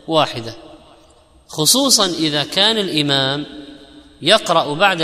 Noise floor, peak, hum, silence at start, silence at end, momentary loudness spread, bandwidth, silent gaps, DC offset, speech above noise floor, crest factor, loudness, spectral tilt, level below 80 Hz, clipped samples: -49 dBFS; 0 dBFS; none; 0.05 s; 0 s; 17 LU; 16 kHz; none; under 0.1%; 33 dB; 18 dB; -15 LUFS; -2.5 dB/octave; -54 dBFS; under 0.1%